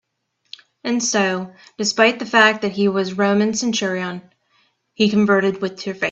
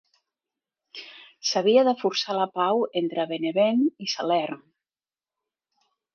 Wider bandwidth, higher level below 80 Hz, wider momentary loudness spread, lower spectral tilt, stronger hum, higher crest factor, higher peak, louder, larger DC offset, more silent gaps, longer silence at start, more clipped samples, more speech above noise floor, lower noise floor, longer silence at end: first, 8.2 kHz vs 7 kHz; first, -64 dBFS vs -80 dBFS; second, 12 LU vs 21 LU; about the same, -4 dB/octave vs -4 dB/octave; neither; about the same, 20 dB vs 20 dB; first, 0 dBFS vs -8 dBFS; first, -18 LUFS vs -24 LUFS; neither; neither; about the same, 0.85 s vs 0.95 s; neither; second, 52 dB vs over 67 dB; second, -70 dBFS vs under -90 dBFS; second, 0 s vs 1.6 s